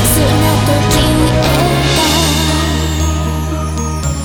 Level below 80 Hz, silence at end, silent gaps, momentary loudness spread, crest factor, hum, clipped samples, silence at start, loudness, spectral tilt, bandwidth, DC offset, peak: -20 dBFS; 0 s; none; 7 LU; 12 dB; none; under 0.1%; 0 s; -12 LUFS; -4.5 dB/octave; over 20 kHz; under 0.1%; 0 dBFS